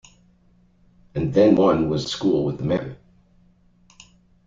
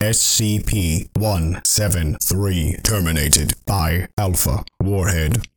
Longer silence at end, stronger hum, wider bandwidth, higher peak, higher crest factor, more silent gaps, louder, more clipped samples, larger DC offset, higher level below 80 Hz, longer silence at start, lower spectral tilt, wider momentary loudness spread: first, 1.5 s vs 0.1 s; neither; second, 7.8 kHz vs 19.5 kHz; second, -4 dBFS vs 0 dBFS; about the same, 18 dB vs 18 dB; second, none vs 4.13-4.17 s; about the same, -20 LUFS vs -18 LUFS; neither; neither; second, -50 dBFS vs -28 dBFS; first, 1.15 s vs 0 s; first, -7 dB/octave vs -4 dB/octave; first, 12 LU vs 6 LU